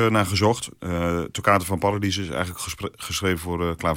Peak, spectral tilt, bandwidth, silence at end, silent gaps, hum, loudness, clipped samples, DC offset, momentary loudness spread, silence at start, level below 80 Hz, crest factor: -4 dBFS; -5 dB/octave; 17 kHz; 0 s; none; none; -24 LUFS; under 0.1%; under 0.1%; 9 LU; 0 s; -48 dBFS; 20 dB